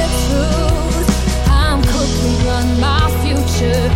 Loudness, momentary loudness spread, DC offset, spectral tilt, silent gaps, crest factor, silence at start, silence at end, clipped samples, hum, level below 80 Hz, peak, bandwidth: -15 LUFS; 2 LU; under 0.1%; -5.5 dB/octave; none; 12 dB; 0 s; 0 s; under 0.1%; none; -18 dBFS; -2 dBFS; 16.5 kHz